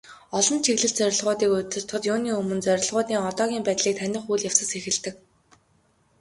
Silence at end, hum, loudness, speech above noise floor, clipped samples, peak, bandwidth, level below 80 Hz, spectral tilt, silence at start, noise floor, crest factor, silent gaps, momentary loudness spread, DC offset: 1.05 s; none; -24 LUFS; 40 dB; under 0.1%; -2 dBFS; 11.5 kHz; -64 dBFS; -2.5 dB/octave; 0.05 s; -64 dBFS; 22 dB; none; 6 LU; under 0.1%